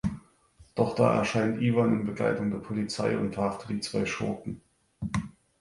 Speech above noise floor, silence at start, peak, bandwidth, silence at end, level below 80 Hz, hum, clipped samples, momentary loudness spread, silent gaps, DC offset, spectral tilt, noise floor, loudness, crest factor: 31 dB; 0.05 s; -8 dBFS; 11.5 kHz; 0.3 s; -54 dBFS; none; under 0.1%; 14 LU; none; under 0.1%; -6.5 dB/octave; -59 dBFS; -29 LUFS; 20 dB